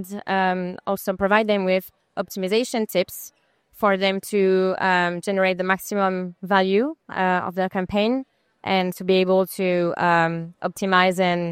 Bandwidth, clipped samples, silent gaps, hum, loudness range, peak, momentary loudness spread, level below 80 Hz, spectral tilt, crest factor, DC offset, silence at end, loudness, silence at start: 16 kHz; under 0.1%; none; none; 2 LU; -4 dBFS; 9 LU; -58 dBFS; -5.5 dB/octave; 18 dB; under 0.1%; 0 s; -22 LUFS; 0 s